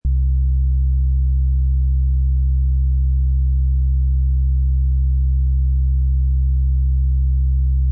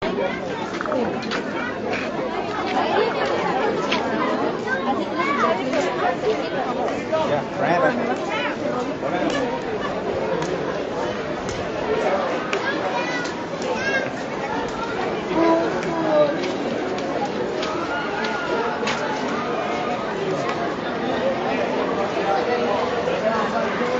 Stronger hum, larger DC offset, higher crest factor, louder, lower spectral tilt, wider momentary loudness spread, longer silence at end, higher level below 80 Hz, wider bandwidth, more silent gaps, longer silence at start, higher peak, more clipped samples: neither; neither; second, 4 dB vs 18 dB; first, -19 LUFS vs -23 LUFS; first, -16.5 dB/octave vs -3 dB/octave; second, 0 LU vs 5 LU; about the same, 0 s vs 0 s; first, -16 dBFS vs -52 dBFS; second, 0.3 kHz vs 8 kHz; neither; about the same, 0.05 s vs 0 s; second, -12 dBFS vs -4 dBFS; neither